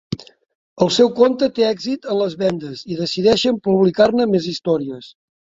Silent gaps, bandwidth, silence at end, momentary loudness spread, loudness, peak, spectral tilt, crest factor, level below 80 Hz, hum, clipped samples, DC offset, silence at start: 0.55-0.76 s; 7.8 kHz; 0.5 s; 13 LU; -17 LUFS; -2 dBFS; -5.5 dB/octave; 16 dB; -54 dBFS; none; under 0.1%; under 0.1%; 0.1 s